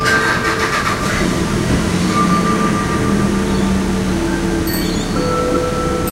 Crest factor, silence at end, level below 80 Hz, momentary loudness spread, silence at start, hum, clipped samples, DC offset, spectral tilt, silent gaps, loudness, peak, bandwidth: 14 dB; 0 s; -28 dBFS; 4 LU; 0 s; none; under 0.1%; under 0.1%; -5 dB/octave; none; -16 LUFS; -2 dBFS; 16.5 kHz